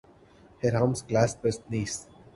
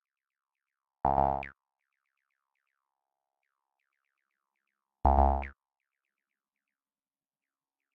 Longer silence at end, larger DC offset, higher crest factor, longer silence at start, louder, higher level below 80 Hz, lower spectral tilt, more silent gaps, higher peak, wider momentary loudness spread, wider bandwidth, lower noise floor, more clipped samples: second, 0.3 s vs 2.45 s; neither; about the same, 22 dB vs 26 dB; second, 0.65 s vs 1.05 s; about the same, -28 LUFS vs -29 LUFS; second, -54 dBFS vs -42 dBFS; second, -5.5 dB/octave vs -10.5 dB/octave; neither; about the same, -8 dBFS vs -10 dBFS; second, 8 LU vs 16 LU; first, 11.5 kHz vs 3.9 kHz; second, -56 dBFS vs under -90 dBFS; neither